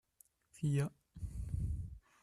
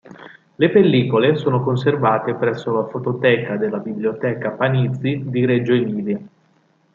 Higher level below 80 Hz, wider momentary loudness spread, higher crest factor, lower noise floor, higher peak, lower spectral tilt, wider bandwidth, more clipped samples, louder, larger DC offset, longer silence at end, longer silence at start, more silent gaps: first, -48 dBFS vs -62 dBFS; first, 13 LU vs 8 LU; about the same, 16 dB vs 18 dB; first, -71 dBFS vs -59 dBFS; second, -24 dBFS vs 0 dBFS; second, -7.5 dB/octave vs -9 dB/octave; first, 13.5 kHz vs 7.2 kHz; neither; second, -41 LUFS vs -19 LUFS; neither; second, 0.25 s vs 0.7 s; first, 0.55 s vs 0.1 s; neither